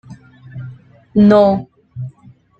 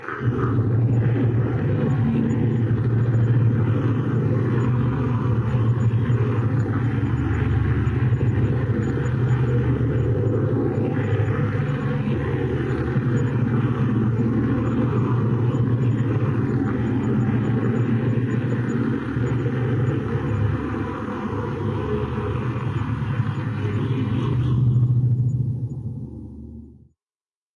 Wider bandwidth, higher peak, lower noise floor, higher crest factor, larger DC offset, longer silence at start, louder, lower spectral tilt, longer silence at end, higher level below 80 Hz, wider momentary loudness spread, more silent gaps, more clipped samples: second, 5.2 kHz vs 7.2 kHz; first, -2 dBFS vs -10 dBFS; second, -46 dBFS vs under -90 dBFS; about the same, 14 dB vs 10 dB; neither; about the same, 0.1 s vs 0 s; first, -12 LUFS vs -22 LUFS; about the same, -9.5 dB/octave vs -9.5 dB/octave; second, 0.5 s vs 0.85 s; second, -50 dBFS vs -40 dBFS; first, 25 LU vs 5 LU; neither; neither